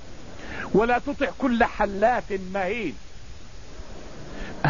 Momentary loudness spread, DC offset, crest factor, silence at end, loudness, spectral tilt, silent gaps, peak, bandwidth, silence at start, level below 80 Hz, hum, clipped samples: 23 LU; 1%; 20 dB; 0 s; -24 LUFS; -6.5 dB/octave; none; -6 dBFS; 7.4 kHz; 0 s; -42 dBFS; none; under 0.1%